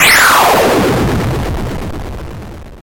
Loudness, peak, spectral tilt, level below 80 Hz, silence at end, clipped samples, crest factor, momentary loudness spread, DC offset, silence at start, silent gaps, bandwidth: -10 LUFS; 0 dBFS; -3.5 dB/octave; -26 dBFS; 0.05 s; under 0.1%; 12 dB; 21 LU; under 0.1%; 0 s; none; 17 kHz